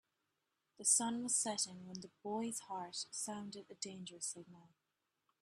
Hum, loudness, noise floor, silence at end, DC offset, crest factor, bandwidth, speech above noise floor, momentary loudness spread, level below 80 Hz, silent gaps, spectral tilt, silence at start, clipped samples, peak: none; -39 LUFS; -87 dBFS; 0.75 s; under 0.1%; 24 dB; 14 kHz; 45 dB; 17 LU; -88 dBFS; none; -2 dB/octave; 0.8 s; under 0.1%; -20 dBFS